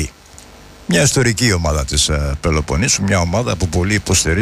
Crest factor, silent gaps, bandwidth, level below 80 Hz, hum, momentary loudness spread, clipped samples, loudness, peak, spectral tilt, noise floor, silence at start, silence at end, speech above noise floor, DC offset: 14 dB; none; 15.5 kHz; -26 dBFS; none; 5 LU; under 0.1%; -15 LUFS; -4 dBFS; -4 dB/octave; -40 dBFS; 0 s; 0 s; 25 dB; under 0.1%